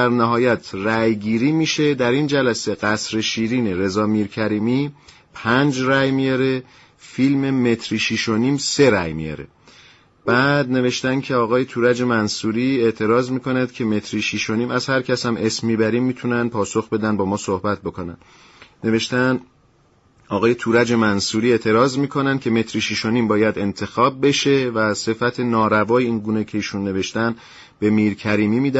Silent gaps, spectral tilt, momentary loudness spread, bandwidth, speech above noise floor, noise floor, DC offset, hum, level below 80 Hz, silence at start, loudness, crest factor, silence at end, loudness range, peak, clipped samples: none; -5 dB/octave; 6 LU; 8 kHz; 38 dB; -56 dBFS; under 0.1%; none; -54 dBFS; 0 s; -19 LUFS; 16 dB; 0 s; 3 LU; -4 dBFS; under 0.1%